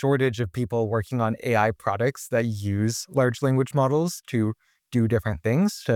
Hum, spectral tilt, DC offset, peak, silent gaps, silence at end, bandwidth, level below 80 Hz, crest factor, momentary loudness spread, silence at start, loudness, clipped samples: none; -6.5 dB/octave; under 0.1%; -8 dBFS; none; 0 s; 17 kHz; -54 dBFS; 16 dB; 4 LU; 0 s; -25 LUFS; under 0.1%